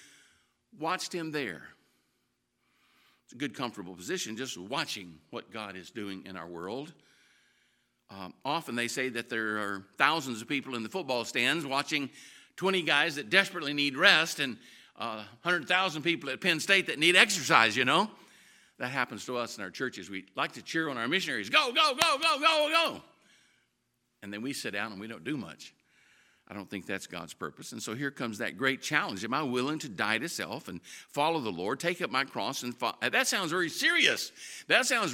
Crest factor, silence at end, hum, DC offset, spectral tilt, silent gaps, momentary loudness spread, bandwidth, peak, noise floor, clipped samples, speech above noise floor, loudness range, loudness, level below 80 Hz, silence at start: 30 dB; 0 s; none; under 0.1%; -2.5 dB/octave; none; 17 LU; 17 kHz; -2 dBFS; -78 dBFS; under 0.1%; 47 dB; 14 LU; -29 LUFS; -80 dBFS; 0.75 s